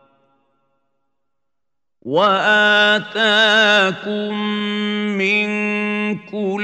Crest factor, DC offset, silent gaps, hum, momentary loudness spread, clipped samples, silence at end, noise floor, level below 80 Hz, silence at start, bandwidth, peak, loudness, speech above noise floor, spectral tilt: 16 dB; under 0.1%; none; none; 11 LU; under 0.1%; 0 s; -84 dBFS; -72 dBFS; 2.05 s; 9 kHz; -2 dBFS; -16 LUFS; 68 dB; -4 dB/octave